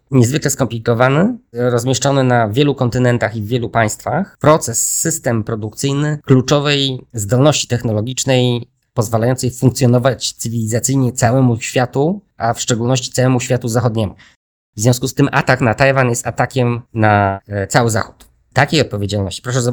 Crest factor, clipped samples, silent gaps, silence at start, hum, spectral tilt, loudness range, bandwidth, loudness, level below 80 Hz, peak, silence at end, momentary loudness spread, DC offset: 16 dB; 0.1%; 14.36-14.73 s; 0.1 s; none; -5 dB/octave; 1 LU; over 20 kHz; -15 LUFS; -46 dBFS; 0 dBFS; 0 s; 7 LU; under 0.1%